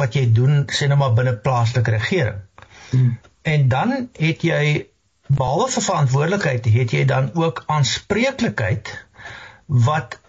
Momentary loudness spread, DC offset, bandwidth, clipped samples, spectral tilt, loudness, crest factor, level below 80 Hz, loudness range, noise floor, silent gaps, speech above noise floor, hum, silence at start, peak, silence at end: 8 LU; under 0.1%; 8 kHz; under 0.1%; -6 dB/octave; -19 LUFS; 10 dB; -50 dBFS; 2 LU; -38 dBFS; none; 20 dB; none; 0 s; -8 dBFS; 0.15 s